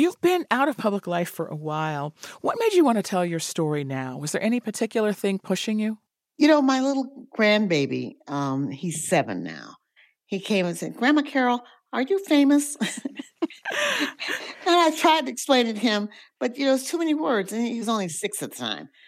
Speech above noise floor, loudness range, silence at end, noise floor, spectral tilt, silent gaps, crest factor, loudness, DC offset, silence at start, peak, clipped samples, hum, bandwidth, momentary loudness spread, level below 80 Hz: 37 dB; 3 LU; 0.2 s; -61 dBFS; -4.5 dB/octave; none; 18 dB; -24 LUFS; under 0.1%; 0 s; -6 dBFS; under 0.1%; none; 16 kHz; 11 LU; -82 dBFS